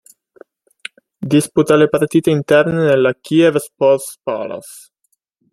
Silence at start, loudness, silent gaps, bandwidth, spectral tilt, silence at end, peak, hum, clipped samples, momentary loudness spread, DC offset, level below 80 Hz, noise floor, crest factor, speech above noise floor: 1.2 s; -14 LUFS; none; 13 kHz; -6 dB/octave; 0.75 s; -2 dBFS; none; under 0.1%; 21 LU; under 0.1%; -56 dBFS; -67 dBFS; 14 dB; 53 dB